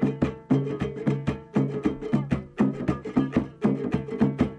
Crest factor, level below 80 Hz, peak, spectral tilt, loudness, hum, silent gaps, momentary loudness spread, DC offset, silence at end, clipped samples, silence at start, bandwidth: 16 dB; -46 dBFS; -8 dBFS; -9 dB/octave; -27 LUFS; none; none; 4 LU; under 0.1%; 0 s; under 0.1%; 0 s; 8.8 kHz